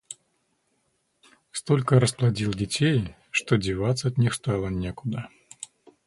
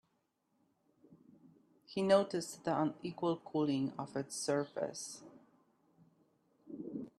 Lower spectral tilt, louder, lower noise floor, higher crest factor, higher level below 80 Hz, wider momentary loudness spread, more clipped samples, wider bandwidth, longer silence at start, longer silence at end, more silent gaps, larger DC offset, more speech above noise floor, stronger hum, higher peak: about the same, -5.5 dB/octave vs -5 dB/octave; first, -25 LUFS vs -37 LUFS; second, -72 dBFS vs -80 dBFS; about the same, 20 dB vs 24 dB; first, -48 dBFS vs -80 dBFS; first, 20 LU vs 15 LU; neither; second, 11.5 kHz vs 13 kHz; second, 0.1 s vs 1.1 s; first, 0.4 s vs 0.1 s; neither; neither; about the same, 48 dB vs 45 dB; neither; first, -6 dBFS vs -16 dBFS